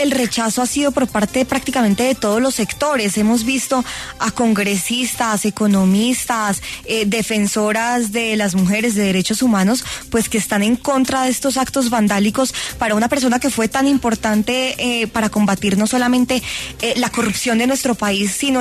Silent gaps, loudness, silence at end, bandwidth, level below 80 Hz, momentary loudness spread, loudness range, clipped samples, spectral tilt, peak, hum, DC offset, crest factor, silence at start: none; -17 LUFS; 0 s; 13.5 kHz; -44 dBFS; 3 LU; 1 LU; under 0.1%; -4 dB/octave; -4 dBFS; none; under 0.1%; 12 dB; 0 s